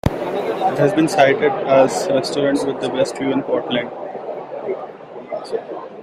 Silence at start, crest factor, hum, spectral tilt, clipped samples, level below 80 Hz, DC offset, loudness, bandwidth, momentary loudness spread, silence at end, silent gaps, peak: 0.05 s; 18 dB; none; -5.5 dB/octave; under 0.1%; -46 dBFS; under 0.1%; -19 LUFS; 15 kHz; 15 LU; 0 s; none; -2 dBFS